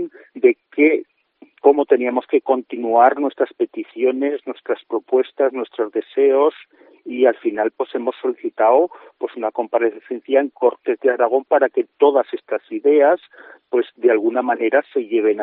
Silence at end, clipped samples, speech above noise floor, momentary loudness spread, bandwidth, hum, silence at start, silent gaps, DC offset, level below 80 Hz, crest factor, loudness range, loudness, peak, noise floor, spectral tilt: 0 s; under 0.1%; 33 dB; 9 LU; 4.1 kHz; none; 0 s; none; under 0.1%; -78 dBFS; 18 dB; 3 LU; -18 LUFS; 0 dBFS; -51 dBFS; -2 dB/octave